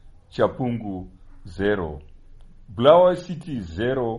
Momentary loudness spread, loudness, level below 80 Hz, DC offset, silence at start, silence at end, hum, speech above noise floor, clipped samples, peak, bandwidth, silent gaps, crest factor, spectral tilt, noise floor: 21 LU; -21 LUFS; -44 dBFS; under 0.1%; 0.05 s; 0 s; none; 23 dB; under 0.1%; -2 dBFS; 10.5 kHz; none; 22 dB; -7.5 dB/octave; -45 dBFS